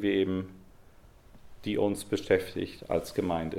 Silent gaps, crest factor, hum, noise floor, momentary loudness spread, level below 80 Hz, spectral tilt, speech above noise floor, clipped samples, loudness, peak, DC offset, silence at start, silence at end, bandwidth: none; 20 dB; none; -55 dBFS; 9 LU; -56 dBFS; -6 dB/octave; 25 dB; under 0.1%; -31 LUFS; -10 dBFS; under 0.1%; 0 s; 0 s; 16.5 kHz